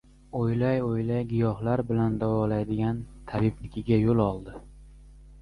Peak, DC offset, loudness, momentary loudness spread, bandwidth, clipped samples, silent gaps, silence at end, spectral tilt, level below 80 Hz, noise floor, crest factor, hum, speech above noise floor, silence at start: -10 dBFS; under 0.1%; -27 LUFS; 12 LU; 10.5 kHz; under 0.1%; none; 0 s; -10 dB/octave; -46 dBFS; -49 dBFS; 18 dB; none; 23 dB; 0.35 s